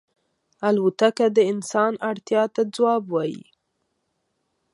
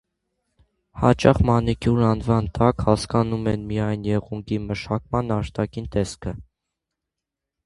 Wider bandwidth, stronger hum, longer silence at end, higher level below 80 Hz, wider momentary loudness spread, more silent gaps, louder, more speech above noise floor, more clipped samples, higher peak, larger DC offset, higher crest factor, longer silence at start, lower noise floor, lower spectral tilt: about the same, 11.5 kHz vs 11.5 kHz; neither; about the same, 1.35 s vs 1.25 s; second, -76 dBFS vs -38 dBFS; about the same, 8 LU vs 10 LU; neither; about the same, -22 LUFS vs -22 LUFS; second, 53 dB vs 64 dB; neither; second, -6 dBFS vs 0 dBFS; neither; about the same, 18 dB vs 22 dB; second, 0.6 s vs 0.95 s; second, -74 dBFS vs -85 dBFS; second, -5 dB/octave vs -7.5 dB/octave